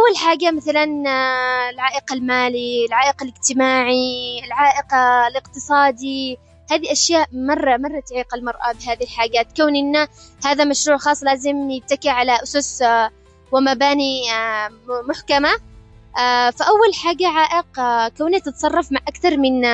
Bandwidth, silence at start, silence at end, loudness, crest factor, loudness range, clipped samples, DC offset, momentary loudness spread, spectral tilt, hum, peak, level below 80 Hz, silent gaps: 9 kHz; 0 s; 0 s; -18 LUFS; 14 dB; 2 LU; under 0.1%; under 0.1%; 9 LU; -2 dB/octave; none; -2 dBFS; -50 dBFS; none